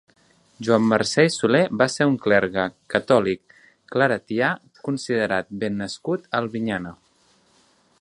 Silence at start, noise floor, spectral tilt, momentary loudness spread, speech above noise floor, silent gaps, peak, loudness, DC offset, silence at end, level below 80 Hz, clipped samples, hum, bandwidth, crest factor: 0.6 s; -61 dBFS; -5 dB/octave; 10 LU; 39 dB; none; -2 dBFS; -22 LUFS; under 0.1%; 1.05 s; -60 dBFS; under 0.1%; none; 11.5 kHz; 20 dB